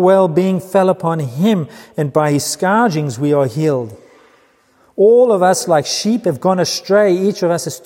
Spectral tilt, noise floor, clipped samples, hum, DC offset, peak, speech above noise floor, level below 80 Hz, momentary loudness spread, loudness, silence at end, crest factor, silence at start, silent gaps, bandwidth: -5.5 dB/octave; -53 dBFS; under 0.1%; none; under 0.1%; -2 dBFS; 40 dB; -64 dBFS; 7 LU; -14 LUFS; 0.05 s; 14 dB; 0 s; none; 16.5 kHz